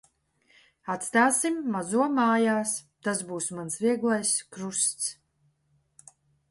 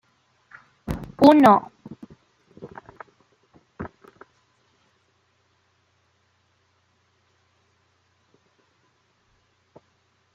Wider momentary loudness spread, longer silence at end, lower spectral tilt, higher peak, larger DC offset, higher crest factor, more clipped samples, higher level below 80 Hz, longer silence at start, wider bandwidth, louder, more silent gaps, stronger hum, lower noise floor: second, 10 LU vs 31 LU; second, 1.35 s vs 6.5 s; second, -3 dB/octave vs -7 dB/octave; second, -10 dBFS vs -2 dBFS; neither; about the same, 20 dB vs 24 dB; neither; second, -74 dBFS vs -54 dBFS; about the same, 0.85 s vs 0.9 s; about the same, 12 kHz vs 11.5 kHz; second, -26 LUFS vs -17 LUFS; neither; neither; about the same, -70 dBFS vs -67 dBFS